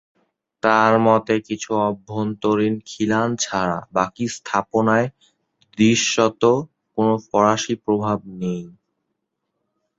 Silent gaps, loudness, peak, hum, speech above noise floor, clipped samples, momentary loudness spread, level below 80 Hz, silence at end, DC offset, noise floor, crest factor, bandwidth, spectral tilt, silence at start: none; -20 LUFS; 0 dBFS; none; 57 dB; under 0.1%; 10 LU; -58 dBFS; 1.3 s; under 0.1%; -77 dBFS; 20 dB; 8 kHz; -4.5 dB/octave; 0.65 s